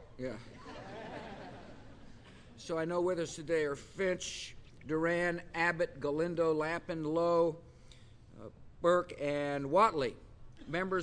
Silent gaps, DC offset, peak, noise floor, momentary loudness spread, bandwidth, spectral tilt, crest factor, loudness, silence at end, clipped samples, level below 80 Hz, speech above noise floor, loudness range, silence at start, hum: none; under 0.1%; -16 dBFS; -56 dBFS; 20 LU; 10.5 kHz; -5 dB/octave; 20 dB; -34 LUFS; 0 s; under 0.1%; -60 dBFS; 22 dB; 5 LU; 0 s; none